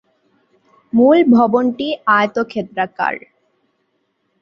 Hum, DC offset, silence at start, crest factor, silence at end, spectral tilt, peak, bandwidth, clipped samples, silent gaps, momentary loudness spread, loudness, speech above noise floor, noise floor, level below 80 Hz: none; under 0.1%; 0.95 s; 16 dB; 1.25 s; -7 dB/octave; -2 dBFS; 6.2 kHz; under 0.1%; none; 11 LU; -15 LUFS; 53 dB; -67 dBFS; -60 dBFS